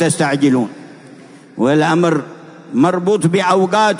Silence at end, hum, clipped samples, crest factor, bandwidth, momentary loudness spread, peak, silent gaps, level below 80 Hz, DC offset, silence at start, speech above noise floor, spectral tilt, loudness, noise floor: 0 s; none; under 0.1%; 14 dB; 11 kHz; 10 LU; -2 dBFS; none; -64 dBFS; under 0.1%; 0 s; 26 dB; -5.5 dB/octave; -15 LUFS; -39 dBFS